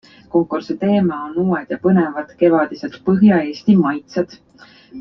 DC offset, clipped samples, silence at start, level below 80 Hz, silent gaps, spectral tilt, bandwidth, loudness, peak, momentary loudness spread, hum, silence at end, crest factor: under 0.1%; under 0.1%; 0.35 s; -56 dBFS; none; -9 dB/octave; 6.2 kHz; -17 LUFS; -2 dBFS; 10 LU; none; 0 s; 14 dB